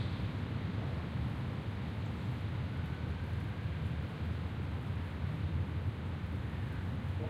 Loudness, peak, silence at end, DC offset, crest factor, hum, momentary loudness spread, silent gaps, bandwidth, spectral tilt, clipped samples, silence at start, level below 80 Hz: -39 LUFS; -24 dBFS; 0 s; under 0.1%; 12 dB; none; 2 LU; none; 10.5 kHz; -8 dB/octave; under 0.1%; 0 s; -46 dBFS